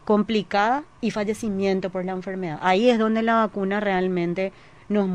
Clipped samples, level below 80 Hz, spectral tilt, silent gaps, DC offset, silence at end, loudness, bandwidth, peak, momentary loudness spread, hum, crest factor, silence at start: under 0.1%; -56 dBFS; -6.5 dB/octave; none; 0.2%; 0 s; -23 LUFS; 11 kHz; -6 dBFS; 9 LU; none; 16 dB; 0.05 s